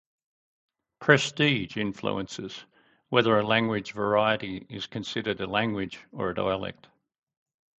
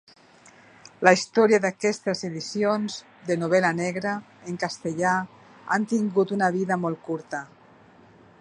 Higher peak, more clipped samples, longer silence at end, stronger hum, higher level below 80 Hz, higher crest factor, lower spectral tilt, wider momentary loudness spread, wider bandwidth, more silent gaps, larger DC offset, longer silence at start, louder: second, -4 dBFS vs 0 dBFS; neither; first, 1.1 s vs 0.95 s; neither; first, -60 dBFS vs -72 dBFS; about the same, 26 dB vs 24 dB; about the same, -5 dB/octave vs -5 dB/octave; about the same, 14 LU vs 14 LU; second, 8.4 kHz vs 10.5 kHz; neither; neither; about the same, 1 s vs 1 s; second, -27 LUFS vs -24 LUFS